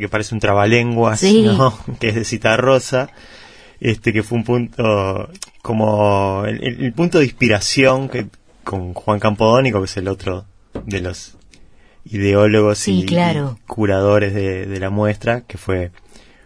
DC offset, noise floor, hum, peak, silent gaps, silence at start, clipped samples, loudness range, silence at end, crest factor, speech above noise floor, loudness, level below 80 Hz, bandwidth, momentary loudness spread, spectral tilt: 0.2%; -45 dBFS; none; 0 dBFS; none; 0 s; under 0.1%; 4 LU; 0.55 s; 16 dB; 29 dB; -16 LUFS; -44 dBFS; 11 kHz; 13 LU; -5.5 dB/octave